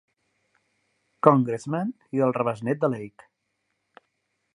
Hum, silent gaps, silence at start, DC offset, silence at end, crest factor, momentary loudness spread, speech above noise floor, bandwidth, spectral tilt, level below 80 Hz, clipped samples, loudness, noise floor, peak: none; none; 1.25 s; under 0.1%; 1.5 s; 26 dB; 10 LU; 53 dB; 11 kHz; -8.5 dB/octave; -72 dBFS; under 0.1%; -24 LUFS; -77 dBFS; 0 dBFS